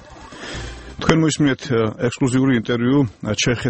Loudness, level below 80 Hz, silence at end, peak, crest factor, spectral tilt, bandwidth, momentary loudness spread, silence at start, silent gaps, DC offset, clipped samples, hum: -19 LUFS; -42 dBFS; 0 s; 0 dBFS; 20 dB; -5.5 dB/octave; 8.8 kHz; 15 LU; 0 s; none; under 0.1%; under 0.1%; none